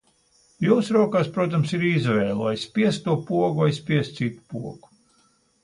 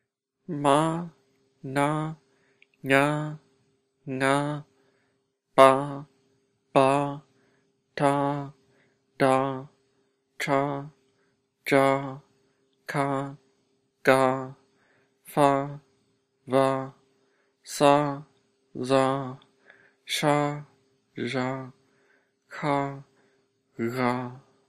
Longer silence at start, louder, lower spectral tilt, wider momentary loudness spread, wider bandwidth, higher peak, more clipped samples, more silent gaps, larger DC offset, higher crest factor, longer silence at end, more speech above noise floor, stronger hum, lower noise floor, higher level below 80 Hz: about the same, 0.6 s vs 0.5 s; about the same, -23 LUFS vs -25 LUFS; first, -7 dB/octave vs -5.5 dB/octave; second, 9 LU vs 20 LU; second, 11 kHz vs 14.5 kHz; second, -6 dBFS vs 0 dBFS; neither; neither; neither; second, 18 dB vs 26 dB; first, 0.85 s vs 0.3 s; second, 41 dB vs 49 dB; neither; second, -63 dBFS vs -73 dBFS; first, -60 dBFS vs -72 dBFS